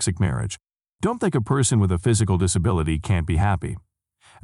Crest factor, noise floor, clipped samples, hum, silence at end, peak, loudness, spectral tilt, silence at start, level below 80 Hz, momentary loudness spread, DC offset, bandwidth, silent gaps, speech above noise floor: 14 dB; -55 dBFS; under 0.1%; none; 0.65 s; -8 dBFS; -22 LUFS; -5.5 dB/octave; 0 s; -36 dBFS; 10 LU; under 0.1%; 12 kHz; none; 34 dB